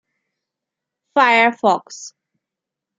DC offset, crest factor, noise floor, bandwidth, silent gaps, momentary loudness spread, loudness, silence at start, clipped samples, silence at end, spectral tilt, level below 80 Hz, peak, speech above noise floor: under 0.1%; 18 dB; -84 dBFS; 9.4 kHz; none; 21 LU; -15 LUFS; 1.15 s; under 0.1%; 0.9 s; -3 dB/octave; -74 dBFS; -2 dBFS; 68 dB